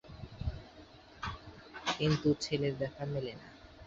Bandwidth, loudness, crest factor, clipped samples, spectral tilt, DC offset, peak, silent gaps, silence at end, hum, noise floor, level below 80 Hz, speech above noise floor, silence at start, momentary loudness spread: 8 kHz; -36 LUFS; 18 dB; under 0.1%; -5.5 dB/octave; under 0.1%; -18 dBFS; none; 0 s; none; -56 dBFS; -52 dBFS; 22 dB; 0.05 s; 22 LU